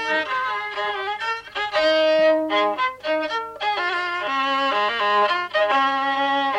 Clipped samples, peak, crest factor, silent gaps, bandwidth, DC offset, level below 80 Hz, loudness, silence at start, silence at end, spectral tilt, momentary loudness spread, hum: under 0.1%; -8 dBFS; 12 dB; none; 10 kHz; under 0.1%; -64 dBFS; -21 LUFS; 0 s; 0 s; -2.5 dB/octave; 7 LU; none